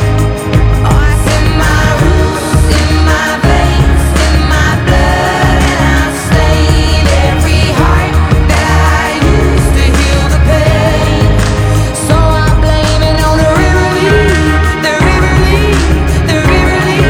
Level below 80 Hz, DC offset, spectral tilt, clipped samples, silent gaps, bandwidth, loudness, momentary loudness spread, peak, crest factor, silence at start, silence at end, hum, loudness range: -12 dBFS; under 0.1%; -5.5 dB/octave; under 0.1%; none; 16 kHz; -9 LUFS; 2 LU; 0 dBFS; 8 dB; 0 s; 0 s; none; 1 LU